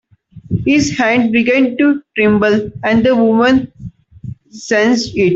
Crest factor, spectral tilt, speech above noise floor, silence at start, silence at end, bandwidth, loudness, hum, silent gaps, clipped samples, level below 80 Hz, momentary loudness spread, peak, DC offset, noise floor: 12 dB; -5.5 dB/octave; 20 dB; 0.35 s; 0 s; 7.8 kHz; -13 LUFS; none; none; under 0.1%; -44 dBFS; 18 LU; -2 dBFS; under 0.1%; -33 dBFS